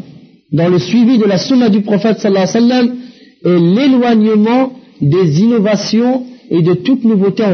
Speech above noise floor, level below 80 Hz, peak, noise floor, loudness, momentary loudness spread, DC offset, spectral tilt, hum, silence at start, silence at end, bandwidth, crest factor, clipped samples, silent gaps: 28 dB; -58 dBFS; -2 dBFS; -39 dBFS; -11 LUFS; 7 LU; under 0.1%; -6.5 dB/octave; none; 0.1 s; 0 s; 6.6 kHz; 8 dB; under 0.1%; none